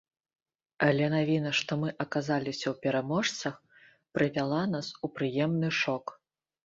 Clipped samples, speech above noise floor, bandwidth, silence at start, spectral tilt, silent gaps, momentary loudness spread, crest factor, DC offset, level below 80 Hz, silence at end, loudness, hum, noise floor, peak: under 0.1%; 31 dB; 7.8 kHz; 0.8 s; -5.5 dB/octave; none; 9 LU; 22 dB; under 0.1%; -68 dBFS; 0.55 s; -30 LUFS; none; -61 dBFS; -10 dBFS